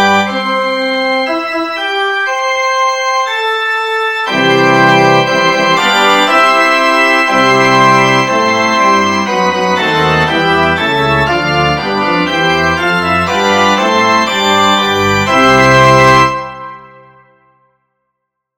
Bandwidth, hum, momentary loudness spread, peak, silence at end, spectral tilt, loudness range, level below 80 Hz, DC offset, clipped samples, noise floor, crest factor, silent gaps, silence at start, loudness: 17 kHz; none; 6 LU; 0 dBFS; 1.7 s; -4 dB/octave; 4 LU; -40 dBFS; 0.3%; 0.5%; -72 dBFS; 10 dB; none; 0 s; -10 LUFS